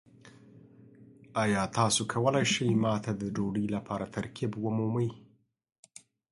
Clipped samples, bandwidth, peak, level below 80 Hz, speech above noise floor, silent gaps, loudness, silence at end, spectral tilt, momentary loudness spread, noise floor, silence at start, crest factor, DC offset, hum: under 0.1%; 11.5 kHz; -10 dBFS; -62 dBFS; 25 dB; none; -30 LUFS; 1.1 s; -5 dB/octave; 9 LU; -55 dBFS; 0.25 s; 20 dB; under 0.1%; none